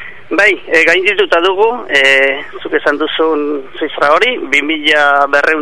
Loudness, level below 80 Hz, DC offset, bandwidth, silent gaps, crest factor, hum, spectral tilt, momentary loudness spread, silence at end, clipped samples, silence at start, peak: -11 LUFS; -52 dBFS; 3%; 12 kHz; none; 12 dB; none; -2.5 dB/octave; 9 LU; 0 s; 0.4%; 0 s; 0 dBFS